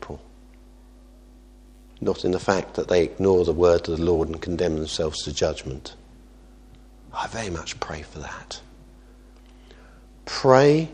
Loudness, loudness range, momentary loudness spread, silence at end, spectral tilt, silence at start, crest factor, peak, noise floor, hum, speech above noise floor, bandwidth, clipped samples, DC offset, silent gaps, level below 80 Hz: -23 LUFS; 12 LU; 19 LU; 0 s; -5.5 dB/octave; 0 s; 24 dB; 0 dBFS; -48 dBFS; none; 26 dB; 10 kHz; under 0.1%; under 0.1%; none; -44 dBFS